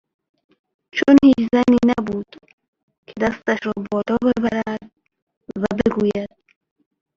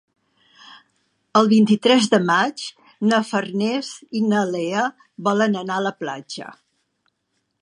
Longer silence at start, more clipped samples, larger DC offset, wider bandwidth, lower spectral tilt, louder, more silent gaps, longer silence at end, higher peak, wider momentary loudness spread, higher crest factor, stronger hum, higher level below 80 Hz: first, 0.95 s vs 0.7 s; neither; neither; second, 7.4 kHz vs 11 kHz; first, -7 dB/octave vs -5 dB/octave; about the same, -18 LUFS vs -20 LUFS; first, 2.53-2.58 s, 2.68-2.73 s, 2.83-2.88 s, 2.98-3.03 s, 5.22-5.27 s, 5.37-5.41 s vs none; second, 0.9 s vs 1.1 s; about the same, -2 dBFS vs -2 dBFS; about the same, 17 LU vs 16 LU; about the same, 18 dB vs 20 dB; neither; first, -50 dBFS vs -72 dBFS